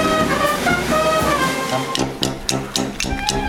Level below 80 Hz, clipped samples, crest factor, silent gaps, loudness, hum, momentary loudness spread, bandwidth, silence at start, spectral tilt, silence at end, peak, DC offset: -36 dBFS; under 0.1%; 20 dB; none; -19 LUFS; none; 5 LU; over 20 kHz; 0 s; -3.5 dB/octave; 0 s; 0 dBFS; under 0.1%